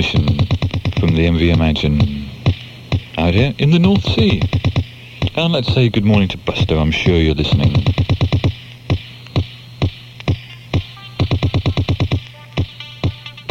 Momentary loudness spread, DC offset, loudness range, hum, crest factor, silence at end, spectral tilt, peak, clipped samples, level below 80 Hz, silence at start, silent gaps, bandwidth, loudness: 10 LU; under 0.1%; 6 LU; none; 16 dB; 0 s; -7.5 dB/octave; 0 dBFS; under 0.1%; -28 dBFS; 0 s; none; 7.6 kHz; -17 LUFS